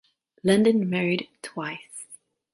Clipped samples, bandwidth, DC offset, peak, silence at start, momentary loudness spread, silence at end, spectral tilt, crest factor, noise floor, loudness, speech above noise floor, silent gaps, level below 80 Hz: under 0.1%; 11.5 kHz; under 0.1%; -6 dBFS; 0.45 s; 20 LU; 0.4 s; -5.5 dB/octave; 20 dB; -52 dBFS; -24 LUFS; 29 dB; none; -68 dBFS